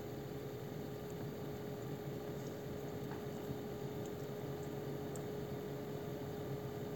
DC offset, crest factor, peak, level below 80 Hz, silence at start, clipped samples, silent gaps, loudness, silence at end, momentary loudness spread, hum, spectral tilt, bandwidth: under 0.1%; 16 dB; -30 dBFS; -66 dBFS; 0 s; under 0.1%; none; -45 LUFS; 0 s; 2 LU; none; -6.5 dB/octave; 17 kHz